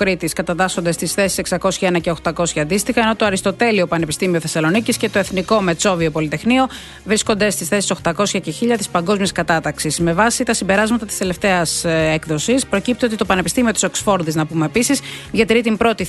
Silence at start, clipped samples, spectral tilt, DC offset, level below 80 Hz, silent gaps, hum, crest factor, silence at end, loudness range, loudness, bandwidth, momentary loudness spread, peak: 0 s; under 0.1%; -4 dB/octave; under 0.1%; -42 dBFS; none; none; 16 dB; 0 s; 1 LU; -17 LUFS; 12.5 kHz; 4 LU; 0 dBFS